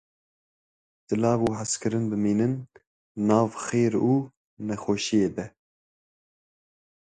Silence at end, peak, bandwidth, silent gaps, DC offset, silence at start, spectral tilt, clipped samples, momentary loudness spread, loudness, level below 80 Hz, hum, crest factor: 1.55 s; -8 dBFS; 9.6 kHz; 2.87-3.15 s, 4.37-4.57 s; under 0.1%; 1.1 s; -6 dB/octave; under 0.1%; 13 LU; -25 LUFS; -60 dBFS; none; 18 dB